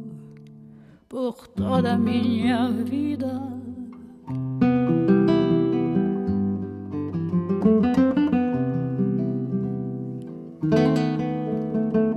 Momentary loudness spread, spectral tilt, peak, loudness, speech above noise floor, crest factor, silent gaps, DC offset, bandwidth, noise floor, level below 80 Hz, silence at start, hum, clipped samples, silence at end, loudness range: 14 LU; -9 dB/octave; -6 dBFS; -23 LUFS; 24 dB; 16 dB; none; under 0.1%; 11 kHz; -48 dBFS; -56 dBFS; 0 s; none; under 0.1%; 0 s; 3 LU